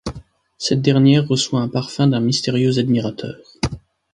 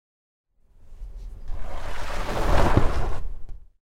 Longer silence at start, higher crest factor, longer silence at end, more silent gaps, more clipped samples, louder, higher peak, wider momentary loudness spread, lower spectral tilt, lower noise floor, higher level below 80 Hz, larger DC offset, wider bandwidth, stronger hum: second, 0.05 s vs 0.85 s; about the same, 16 dB vs 18 dB; about the same, 0.35 s vs 0.3 s; neither; neither; first, -18 LUFS vs -27 LUFS; about the same, -2 dBFS vs -4 dBFS; second, 15 LU vs 23 LU; about the same, -6 dB/octave vs -6 dB/octave; second, -39 dBFS vs -46 dBFS; second, -44 dBFS vs -28 dBFS; neither; about the same, 11 kHz vs 10.5 kHz; neither